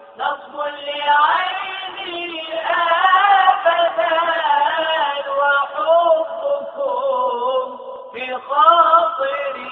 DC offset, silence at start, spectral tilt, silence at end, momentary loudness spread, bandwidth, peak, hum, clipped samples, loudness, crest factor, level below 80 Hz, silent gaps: under 0.1%; 0 s; 3 dB/octave; 0 s; 13 LU; 4.3 kHz; 0 dBFS; none; under 0.1%; -17 LUFS; 18 dB; -70 dBFS; none